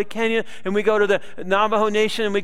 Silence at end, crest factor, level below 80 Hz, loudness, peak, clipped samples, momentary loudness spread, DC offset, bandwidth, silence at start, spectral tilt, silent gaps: 0 s; 16 dB; -58 dBFS; -20 LUFS; -4 dBFS; under 0.1%; 5 LU; 3%; 13.5 kHz; 0 s; -4.5 dB/octave; none